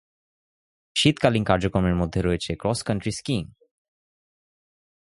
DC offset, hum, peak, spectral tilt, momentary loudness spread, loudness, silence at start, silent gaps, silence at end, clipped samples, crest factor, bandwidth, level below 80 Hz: under 0.1%; none; -4 dBFS; -5.5 dB/octave; 9 LU; -24 LUFS; 0.95 s; none; 1.65 s; under 0.1%; 22 dB; 11.5 kHz; -42 dBFS